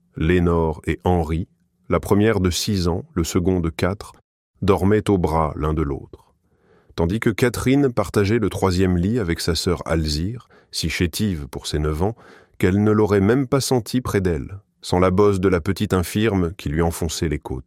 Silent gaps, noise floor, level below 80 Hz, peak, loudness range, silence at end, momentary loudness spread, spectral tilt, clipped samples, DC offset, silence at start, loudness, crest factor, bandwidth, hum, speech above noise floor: 4.24-4.54 s; -59 dBFS; -36 dBFS; -2 dBFS; 3 LU; 0.05 s; 9 LU; -6 dB/octave; under 0.1%; under 0.1%; 0.15 s; -21 LUFS; 18 dB; 16.5 kHz; none; 39 dB